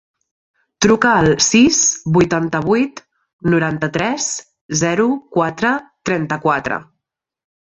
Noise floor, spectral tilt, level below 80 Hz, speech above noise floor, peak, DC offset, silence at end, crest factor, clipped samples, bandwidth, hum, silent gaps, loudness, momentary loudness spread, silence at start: -78 dBFS; -4 dB/octave; -48 dBFS; 63 dB; -2 dBFS; under 0.1%; 0.8 s; 16 dB; under 0.1%; 8.4 kHz; none; 3.33-3.39 s, 4.61-4.69 s; -16 LUFS; 10 LU; 0.8 s